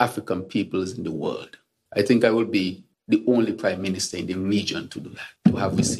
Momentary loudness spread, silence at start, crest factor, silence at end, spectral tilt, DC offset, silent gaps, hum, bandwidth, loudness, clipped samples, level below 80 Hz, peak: 14 LU; 0 s; 22 dB; 0 s; -5 dB/octave; under 0.1%; none; none; 13 kHz; -24 LUFS; under 0.1%; -56 dBFS; -2 dBFS